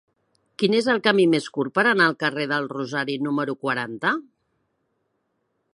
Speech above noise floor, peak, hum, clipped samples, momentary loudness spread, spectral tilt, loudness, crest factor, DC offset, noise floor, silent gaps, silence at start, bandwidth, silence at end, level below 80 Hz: 51 dB; -4 dBFS; none; under 0.1%; 8 LU; -5 dB/octave; -22 LUFS; 20 dB; under 0.1%; -73 dBFS; none; 0.6 s; 11.5 kHz; 1.55 s; -72 dBFS